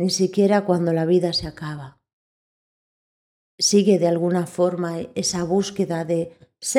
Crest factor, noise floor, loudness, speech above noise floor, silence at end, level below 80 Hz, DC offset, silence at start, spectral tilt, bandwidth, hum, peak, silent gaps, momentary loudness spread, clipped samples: 18 dB; under -90 dBFS; -21 LUFS; over 69 dB; 0 s; -54 dBFS; under 0.1%; 0 s; -5 dB/octave; 15.5 kHz; none; -4 dBFS; 2.13-3.58 s; 13 LU; under 0.1%